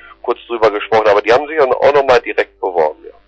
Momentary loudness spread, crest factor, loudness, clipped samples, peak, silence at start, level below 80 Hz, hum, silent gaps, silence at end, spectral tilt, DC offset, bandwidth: 8 LU; 10 dB; -13 LUFS; under 0.1%; -2 dBFS; 0.1 s; -48 dBFS; none; none; 0.2 s; -4.5 dB/octave; under 0.1%; 8 kHz